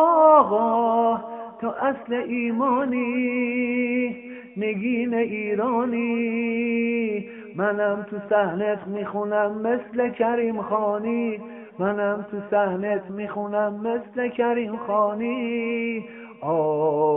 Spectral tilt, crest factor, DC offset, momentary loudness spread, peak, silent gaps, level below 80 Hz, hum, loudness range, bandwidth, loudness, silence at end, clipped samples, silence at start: -5 dB/octave; 20 dB; under 0.1%; 8 LU; -4 dBFS; none; -68 dBFS; none; 2 LU; 3.6 kHz; -24 LUFS; 0 s; under 0.1%; 0 s